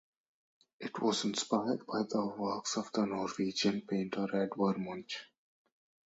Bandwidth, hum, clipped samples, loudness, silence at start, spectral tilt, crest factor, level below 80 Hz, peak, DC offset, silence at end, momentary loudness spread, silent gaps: 8.2 kHz; none; under 0.1%; -35 LUFS; 0.8 s; -4.5 dB/octave; 20 dB; -76 dBFS; -16 dBFS; under 0.1%; 0.85 s; 9 LU; none